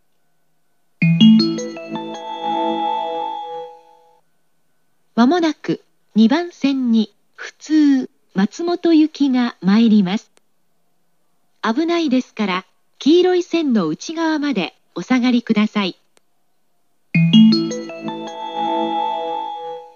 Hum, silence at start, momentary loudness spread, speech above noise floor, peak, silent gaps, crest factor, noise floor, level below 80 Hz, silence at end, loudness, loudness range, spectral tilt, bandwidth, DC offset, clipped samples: none; 1 s; 15 LU; 54 dB; 0 dBFS; none; 18 dB; -70 dBFS; -80 dBFS; 0.1 s; -18 LUFS; 5 LU; -6.5 dB/octave; 7.2 kHz; 0.1%; under 0.1%